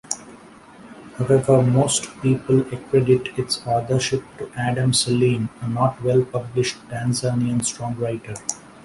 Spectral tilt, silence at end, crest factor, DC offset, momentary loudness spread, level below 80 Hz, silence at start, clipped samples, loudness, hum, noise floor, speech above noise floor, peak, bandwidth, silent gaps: -5 dB/octave; 0.05 s; 18 dB; under 0.1%; 10 LU; -52 dBFS; 0.1 s; under 0.1%; -21 LUFS; none; -45 dBFS; 24 dB; -4 dBFS; 11.5 kHz; none